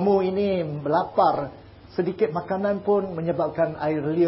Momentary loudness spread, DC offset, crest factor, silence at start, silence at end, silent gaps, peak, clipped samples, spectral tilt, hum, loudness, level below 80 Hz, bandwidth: 7 LU; under 0.1%; 16 dB; 0 s; 0 s; none; -8 dBFS; under 0.1%; -12 dB/octave; none; -24 LUFS; -54 dBFS; 5.8 kHz